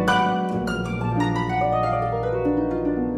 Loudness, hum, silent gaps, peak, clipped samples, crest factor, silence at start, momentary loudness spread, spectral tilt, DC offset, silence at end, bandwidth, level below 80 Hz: -23 LUFS; none; none; -8 dBFS; under 0.1%; 14 dB; 0 s; 4 LU; -7 dB/octave; under 0.1%; 0 s; 13 kHz; -40 dBFS